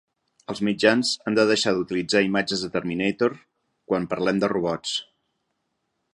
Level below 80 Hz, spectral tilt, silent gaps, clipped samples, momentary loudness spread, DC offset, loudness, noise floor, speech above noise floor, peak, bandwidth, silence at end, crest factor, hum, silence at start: -60 dBFS; -4.5 dB/octave; none; under 0.1%; 8 LU; under 0.1%; -23 LUFS; -76 dBFS; 53 dB; -4 dBFS; 11.5 kHz; 1.1 s; 22 dB; none; 0.5 s